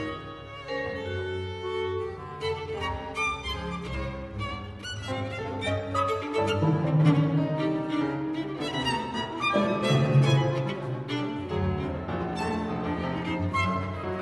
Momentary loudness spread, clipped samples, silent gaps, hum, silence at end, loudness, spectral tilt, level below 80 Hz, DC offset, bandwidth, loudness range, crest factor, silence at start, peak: 11 LU; under 0.1%; none; none; 0 s; -28 LUFS; -6.5 dB/octave; -48 dBFS; under 0.1%; 11.5 kHz; 6 LU; 18 dB; 0 s; -10 dBFS